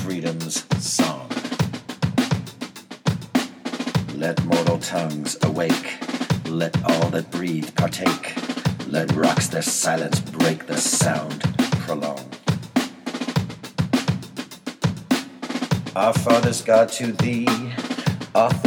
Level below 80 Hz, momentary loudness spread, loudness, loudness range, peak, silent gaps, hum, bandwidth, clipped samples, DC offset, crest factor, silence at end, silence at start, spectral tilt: -52 dBFS; 9 LU; -22 LUFS; 4 LU; -2 dBFS; none; none; over 20 kHz; under 0.1%; under 0.1%; 20 dB; 0 s; 0 s; -4.5 dB/octave